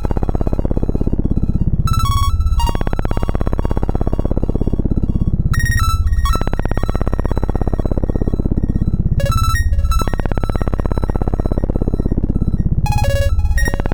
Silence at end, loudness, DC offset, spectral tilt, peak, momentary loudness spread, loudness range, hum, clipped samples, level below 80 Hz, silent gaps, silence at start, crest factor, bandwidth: 0 s; -19 LUFS; under 0.1%; -6.5 dB/octave; -2 dBFS; 4 LU; 1 LU; 50 Hz at -25 dBFS; under 0.1%; -18 dBFS; none; 0 s; 12 dB; 20 kHz